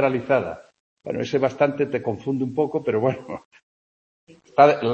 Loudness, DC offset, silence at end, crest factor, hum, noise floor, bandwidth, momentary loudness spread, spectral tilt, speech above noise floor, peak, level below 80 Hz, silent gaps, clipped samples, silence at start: -22 LUFS; under 0.1%; 0 s; 22 dB; none; under -90 dBFS; 7.8 kHz; 18 LU; -7 dB/octave; over 69 dB; -2 dBFS; -64 dBFS; 0.80-0.97 s, 3.45-3.51 s, 3.63-4.27 s; under 0.1%; 0 s